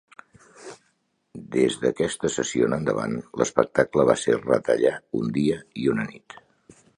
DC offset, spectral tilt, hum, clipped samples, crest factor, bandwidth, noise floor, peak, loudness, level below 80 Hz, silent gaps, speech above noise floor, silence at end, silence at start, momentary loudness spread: under 0.1%; -5 dB/octave; none; under 0.1%; 24 dB; 11 kHz; -70 dBFS; -2 dBFS; -24 LUFS; -56 dBFS; none; 47 dB; 0.8 s; 0.6 s; 9 LU